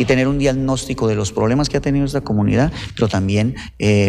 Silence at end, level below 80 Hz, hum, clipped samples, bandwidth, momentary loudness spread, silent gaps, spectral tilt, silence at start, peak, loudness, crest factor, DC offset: 0 s; -34 dBFS; none; under 0.1%; 13 kHz; 5 LU; none; -6 dB/octave; 0 s; -4 dBFS; -18 LUFS; 12 dB; under 0.1%